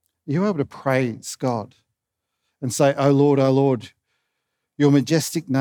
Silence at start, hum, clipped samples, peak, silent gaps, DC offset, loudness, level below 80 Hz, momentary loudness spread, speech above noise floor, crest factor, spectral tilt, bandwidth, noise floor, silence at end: 0.25 s; none; under 0.1%; -4 dBFS; none; under 0.1%; -20 LUFS; -72 dBFS; 11 LU; 61 dB; 16 dB; -6 dB/octave; 19.5 kHz; -81 dBFS; 0 s